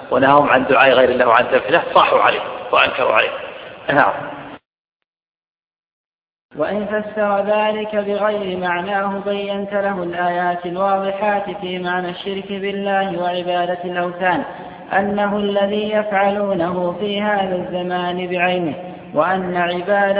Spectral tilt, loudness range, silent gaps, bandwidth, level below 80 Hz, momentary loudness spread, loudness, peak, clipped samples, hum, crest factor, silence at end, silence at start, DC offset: -8.5 dB/octave; 7 LU; 4.66-4.71 s, 4.79-4.85 s, 4.92-5.00 s, 5.06-5.13 s, 5.22-5.55 s, 5.64-5.71 s, 5.78-6.25 s, 6.32-6.49 s; 5.2 kHz; -56 dBFS; 11 LU; -18 LUFS; 0 dBFS; under 0.1%; none; 18 dB; 0 s; 0 s; under 0.1%